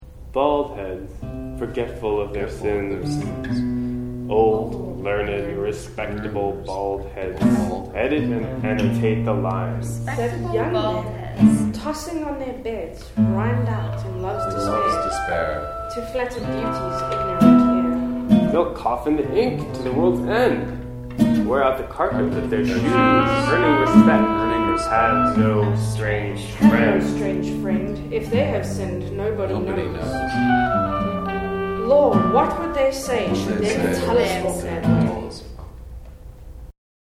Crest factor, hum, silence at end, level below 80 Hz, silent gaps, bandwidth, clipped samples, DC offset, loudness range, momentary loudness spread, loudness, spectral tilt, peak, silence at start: 20 dB; none; 0.5 s; -38 dBFS; none; 15 kHz; under 0.1%; under 0.1%; 7 LU; 12 LU; -21 LUFS; -7 dB/octave; 0 dBFS; 0 s